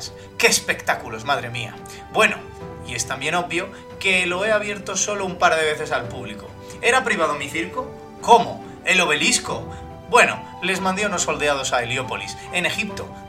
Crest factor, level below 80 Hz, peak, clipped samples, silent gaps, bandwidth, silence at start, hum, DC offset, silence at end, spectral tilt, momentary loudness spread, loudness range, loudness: 22 dB; -50 dBFS; 0 dBFS; under 0.1%; none; 16.5 kHz; 0 s; none; under 0.1%; 0 s; -2.5 dB/octave; 16 LU; 3 LU; -20 LUFS